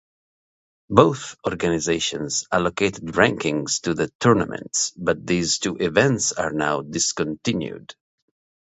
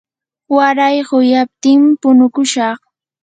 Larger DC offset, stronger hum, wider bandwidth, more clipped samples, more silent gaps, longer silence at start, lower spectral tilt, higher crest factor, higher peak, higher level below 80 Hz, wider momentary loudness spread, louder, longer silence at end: neither; neither; second, 8.2 kHz vs 9.4 kHz; neither; first, 4.15-4.20 s vs none; first, 0.9 s vs 0.5 s; about the same, -4 dB/octave vs -3 dB/octave; first, 22 dB vs 12 dB; about the same, 0 dBFS vs 0 dBFS; first, -50 dBFS vs -68 dBFS; about the same, 7 LU vs 7 LU; second, -21 LUFS vs -12 LUFS; first, 0.7 s vs 0.5 s